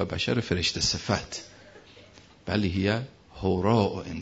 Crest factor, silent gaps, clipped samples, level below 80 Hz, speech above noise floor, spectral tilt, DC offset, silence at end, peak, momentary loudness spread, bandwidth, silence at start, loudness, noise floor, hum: 20 dB; none; under 0.1%; -50 dBFS; 26 dB; -4.5 dB/octave; under 0.1%; 0 s; -10 dBFS; 15 LU; 8 kHz; 0 s; -27 LUFS; -52 dBFS; none